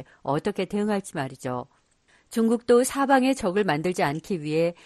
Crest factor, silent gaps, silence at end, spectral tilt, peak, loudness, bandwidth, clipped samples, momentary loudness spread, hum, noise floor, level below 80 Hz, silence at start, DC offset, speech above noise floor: 18 dB; none; 0.1 s; -5.5 dB/octave; -6 dBFS; -25 LUFS; 13 kHz; under 0.1%; 12 LU; none; -63 dBFS; -60 dBFS; 0 s; under 0.1%; 38 dB